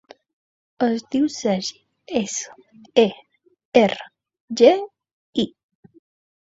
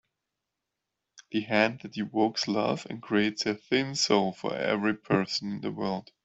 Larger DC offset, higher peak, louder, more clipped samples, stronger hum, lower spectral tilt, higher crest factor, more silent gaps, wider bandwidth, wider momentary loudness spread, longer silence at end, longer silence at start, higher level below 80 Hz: neither; first, -2 dBFS vs -6 dBFS; first, -21 LUFS vs -28 LUFS; neither; neither; about the same, -4.5 dB/octave vs -4.5 dB/octave; about the same, 22 dB vs 22 dB; first, 3.65-3.72 s, 4.40-4.48 s, 5.13-5.33 s vs none; about the same, 8 kHz vs 8.2 kHz; first, 15 LU vs 8 LU; first, 1 s vs 0.25 s; second, 0.8 s vs 1.15 s; about the same, -64 dBFS vs -68 dBFS